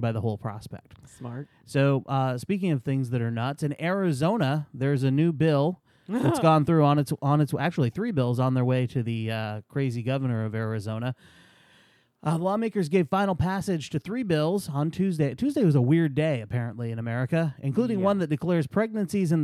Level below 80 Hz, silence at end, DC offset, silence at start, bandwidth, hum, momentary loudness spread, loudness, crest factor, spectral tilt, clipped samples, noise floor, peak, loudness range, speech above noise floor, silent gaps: -58 dBFS; 0 s; under 0.1%; 0 s; 14 kHz; none; 10 LU; -26 LUFS; 20 dB; -7.5 dB/octave; under 0.1%; -61 dBFS; -6 dBFS; 5 LU; 36 dB; none